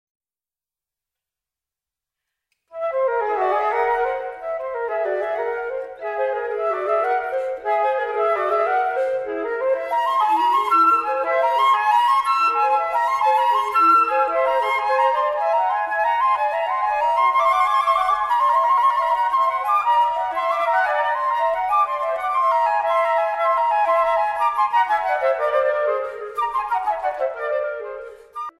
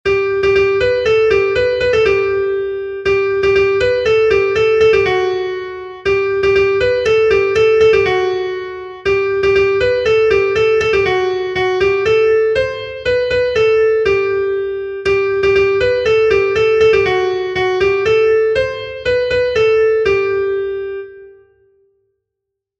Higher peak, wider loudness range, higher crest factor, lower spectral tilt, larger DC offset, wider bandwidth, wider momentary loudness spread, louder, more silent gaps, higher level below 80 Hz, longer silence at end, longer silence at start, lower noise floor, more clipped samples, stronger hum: second, -6 dBFS vs -2 dBFS; first, 6 LU vs 2 LU; about the same, 14 dB vs 12 dB; second, -2.5 dB/octave vs -5.5 dB/octave; neither; first, 14.5 kHz vs 8 kHz; about the same, 8 LU vs 8 LU; second, -20 LUFS vs -14 LUFS; neither; second, -58 dBFS vs -40 dBFS; second, 0.1 s vs 1.5 s; first, 2.75 s vs 0.05 s; first, under -90 dBFS vs -79 dBFS; neither; neither